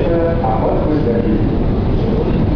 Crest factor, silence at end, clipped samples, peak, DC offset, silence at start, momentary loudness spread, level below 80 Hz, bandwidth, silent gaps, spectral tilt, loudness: 10 dB; 0 s; under 0.1%; -4 dBFS; 2%; 0 s; 1 LU; -20 dBFS; 5.4 kHz; none; -10.5 dB/octave; -16 LUFS